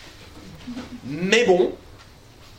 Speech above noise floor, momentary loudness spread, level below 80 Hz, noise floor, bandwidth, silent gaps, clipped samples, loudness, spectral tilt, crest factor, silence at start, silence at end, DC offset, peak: 26 dB; 26 LU; -50 dBFS; -47 dBFS; 15 kHz; none; under 0.1%; -20 LUFS; -4.5 dB/octave; 24 dB; 0 s; 0.55 s; under 0.1%; 0 dBFS